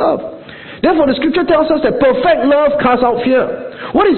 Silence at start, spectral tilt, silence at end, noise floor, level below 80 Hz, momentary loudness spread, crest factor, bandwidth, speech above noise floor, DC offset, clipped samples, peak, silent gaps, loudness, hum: 0 s; -11 dB/octave; 0 s; -32 dBFS; -42 dBFS; 11 LU; 12 dB; 4.4 kHz; 20 dB; under 0.1%; under 0.1%; 0 dBFS; none; -13 LUFS; none